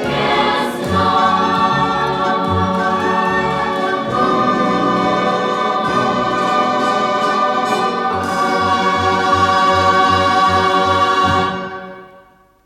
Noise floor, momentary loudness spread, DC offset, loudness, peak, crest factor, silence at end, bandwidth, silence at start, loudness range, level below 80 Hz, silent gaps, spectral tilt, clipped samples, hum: -47 dBFS; 5 LU; under 0.1%; -15 LUFS; -2 dBFS; 14 dB; 0.6 s; 14 kHz; 0 s; 2 LU; -48 dBFS; none; -5 dB/octave; under 0.1%; none